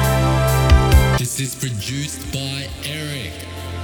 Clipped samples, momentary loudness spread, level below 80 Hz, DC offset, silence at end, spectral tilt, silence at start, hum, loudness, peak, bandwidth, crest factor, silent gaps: under 0.1%; 13 LU; -22 dBFS; under 0.1%; 0 s; -5 dB/octave; 0 s; none; -19 LUFS; -2 dBFS; 19.5 kHz; 16 dB; none